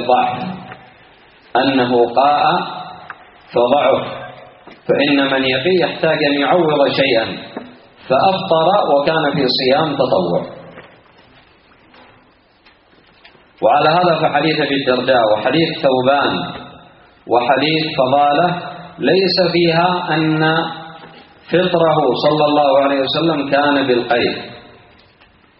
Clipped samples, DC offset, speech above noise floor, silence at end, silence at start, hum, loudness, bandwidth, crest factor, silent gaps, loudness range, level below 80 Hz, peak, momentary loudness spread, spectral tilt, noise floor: under 0.1%; under 0.1%; 37 dB; 1 s; 0 s; none; -15 LUFS; 5.6 kHz; 16 dB; none; 4 LU; -56 dBFS; 0 dBFS; 14 LU; -3 dB/octave; -51 dBFS